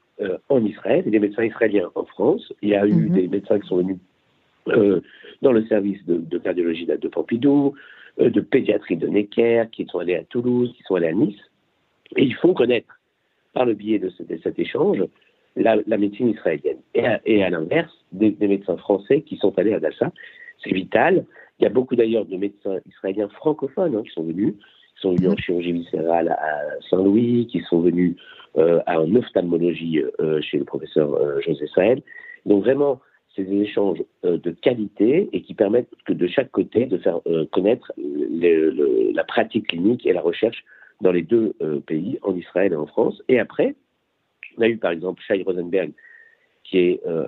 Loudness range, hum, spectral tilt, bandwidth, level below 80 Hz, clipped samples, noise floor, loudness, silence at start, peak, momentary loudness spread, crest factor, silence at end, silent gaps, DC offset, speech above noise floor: 3 LU; none; -9.5 dB/octave; 4.3 kHz; -62 dBFS; under 0.1%; -70 dBFS; -21 LUFS; 0.2 s; -2 dBFS; 8 LU; 18 dB; 0 s; none; under 0.1%; 50 dB